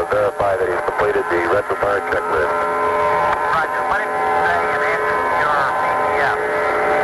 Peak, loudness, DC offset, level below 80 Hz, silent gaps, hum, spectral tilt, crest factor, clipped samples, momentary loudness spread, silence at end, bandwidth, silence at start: -6 dBFS; -18 LUFS; under 0.1%; -46 dBFS; none; none; -4.5 dB/octave; 12 dB; under 0.1%; 2 LU; 0 s; 12.5 kHz; 0 s